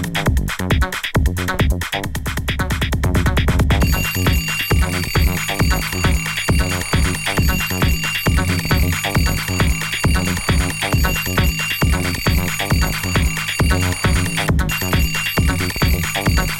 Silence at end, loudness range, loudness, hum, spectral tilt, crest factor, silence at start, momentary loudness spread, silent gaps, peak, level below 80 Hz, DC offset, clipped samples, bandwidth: 0 s; 1 LU; -18 LUFS; none; -4.5 dB/octave; 14 dB; 0 s; 2 LU; none; -2 dBFS; -22 dBFS; under 0.1%; under 0.1%; 18.5 kHz